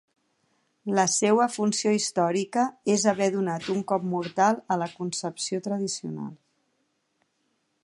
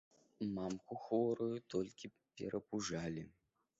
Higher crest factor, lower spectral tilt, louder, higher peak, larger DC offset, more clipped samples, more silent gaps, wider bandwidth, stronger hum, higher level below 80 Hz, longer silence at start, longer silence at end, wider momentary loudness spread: about the same, 20 dB vs 18 dB; second, -4 dB/octave vs -6 dB/octave; first, -26 LUFS vs -42 LUFS; first, -8 dBFS vs -24 dBFS; neither; neither; neither; first, 11.5 kHz vs 8 kHz; neither; about the same, -74 dBFS vs -72 dBFS; first, 0.85 s vs 0.4 s; first, 1.5 s vs 0.5 s; second, 9 LU vs 12 LU